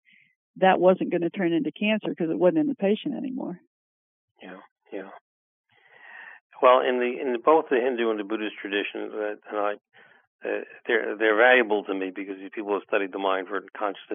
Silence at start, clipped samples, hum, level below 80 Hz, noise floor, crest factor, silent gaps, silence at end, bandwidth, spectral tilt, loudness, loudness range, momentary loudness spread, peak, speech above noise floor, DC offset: 0.55 s; under 0.1%; none; under -90 dBFS; -52 dBFS; 22 dB; 3.67-4.35 s, 4.71-4.76 s, 5.21-5.64 s, 6.41-6.50 s, 10.27-10.39 s; 0 s; 3.8 kHz; -9 dB/octave; -24 LUFS; 7 LU; 20 LU; -4 dBFS; 27 dB; under 0.1%